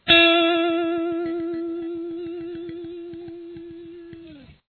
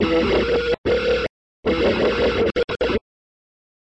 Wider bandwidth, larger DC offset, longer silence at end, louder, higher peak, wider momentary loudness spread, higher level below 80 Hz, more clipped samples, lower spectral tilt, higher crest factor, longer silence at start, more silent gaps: second, 4.4 kHz vs 8.2 kHz; neither; second, 0.15 s vs 1 s; about the same, -21 LUFS vs -21 LUFS; first, -2 dBFS vs -8 dBFS; first, 24 LU vs 6 LU; second, -56 dBFS vs -38 dBFS; neither; about the same, -6 dB/octave vs -6 dB/octave; first, 22 dB vs 12 dB; about the same, 0.05 s vs 0 s; second, none vs 0.78-0.84 s, 1.29-1.63 s, 2.64-2.68 s